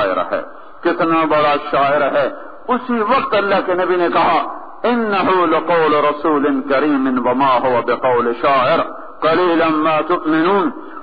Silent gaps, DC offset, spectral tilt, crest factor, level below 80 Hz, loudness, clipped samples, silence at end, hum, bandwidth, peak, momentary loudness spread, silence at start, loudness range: none; 2%; -8.5 dB/octave; 12 dB; -54 dBFS; -15 LUFS; under 0.1%; 0 s; none; 5 kHz; -2 dBFS; 7 LU; 0 s; 2 LU